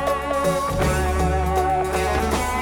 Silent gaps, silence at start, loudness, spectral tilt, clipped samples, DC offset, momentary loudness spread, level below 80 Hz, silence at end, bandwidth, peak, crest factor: none; 0 s; -21 LUFS; -5 dB/octave; under 0.1%; under 0.1%; 1 LU; -28 dBFS; 0 s; 17.5 kHz; -6 dBFS; 14 dB